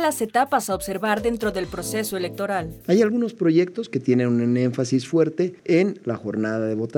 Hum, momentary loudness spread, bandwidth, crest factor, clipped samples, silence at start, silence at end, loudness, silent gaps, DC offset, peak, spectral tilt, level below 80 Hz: none; 7 LU; 19 kHz; 16 dB; under 0.1%; 0 s; 0 s; -22 LUFS; none; under 0.1%; -6 dBFS; -6 dB/octave; -52 dBFS